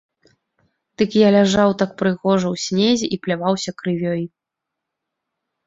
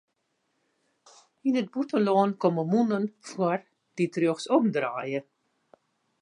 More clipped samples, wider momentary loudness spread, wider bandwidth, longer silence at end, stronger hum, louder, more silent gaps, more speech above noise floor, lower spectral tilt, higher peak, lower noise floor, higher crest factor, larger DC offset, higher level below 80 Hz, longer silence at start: neither; about the same, 10 LU vs 10 LU; second, 7.8 kHz vs 10.5 kHz; first, 1.4 s vs 1 s; neither; first, -18 LUFS vs -27 LUFS; neither; first, 65 dB vs 50 dB; second, -5.5 dB/octave vs -7 dB/octave; first, -2 dBFS vs -10 dBFS; first, -82 dBFS vs -76 dBFS; about the same, 18 dB vs 18 dB; neither; first, -56 dBFS vs -82 dBFS; second, 1 s vs 1.45 s